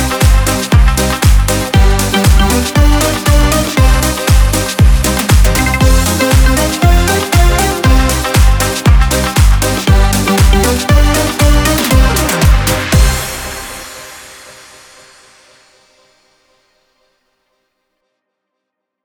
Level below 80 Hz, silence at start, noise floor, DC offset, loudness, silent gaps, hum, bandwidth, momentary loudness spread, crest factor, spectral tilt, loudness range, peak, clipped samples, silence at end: -12 dBFS; 0 s; -75 dBFS; under 0.1%; -11 LUFS; none; none; over 20 kHz; 3 LU; 10 dB; -4.5 dB/octave; 5 LU; 0 dBFS; under 0.1%; 4.55 s